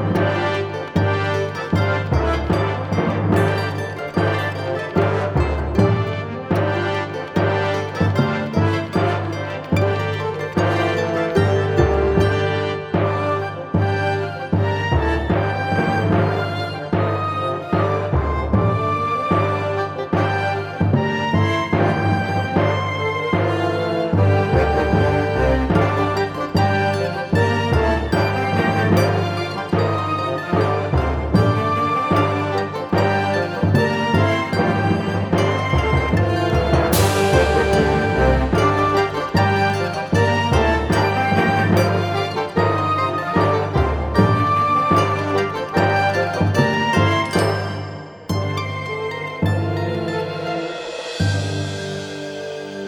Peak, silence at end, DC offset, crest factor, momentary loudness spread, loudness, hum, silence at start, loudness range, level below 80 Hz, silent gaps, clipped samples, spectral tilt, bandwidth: -2 dBFS; 0 s; under 0.1%; 16 dB; 7 LU; -19 LUFS; none; 0 s; 3 LU; -32 dBFS; none; under 0.1%; -6.5 dB/octave; 19 kHz